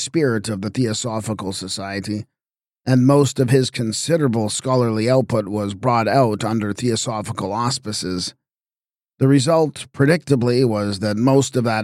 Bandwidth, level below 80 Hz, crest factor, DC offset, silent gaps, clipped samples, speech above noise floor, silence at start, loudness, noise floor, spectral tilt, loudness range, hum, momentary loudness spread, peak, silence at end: 15 kHz; -58 dBFS; 16 dB; under 0.1%; none; under 0.1%; over 72 dB; 0 s; -19 LUFS; under -90 dBFS; -5.5 dB/octave; 3 LU; none; 9 LU; -2 dBFS; 0 s